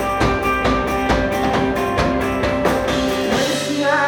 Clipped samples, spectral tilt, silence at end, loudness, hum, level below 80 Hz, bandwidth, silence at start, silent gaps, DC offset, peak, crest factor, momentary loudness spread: under 0.1%; -5 dB/octave; 0 s; -18 LUFS; none; -32 dBFS; 19 kHz; 0 s; none; under 0.1%; -2 dBFS; 16 dB; 1 LU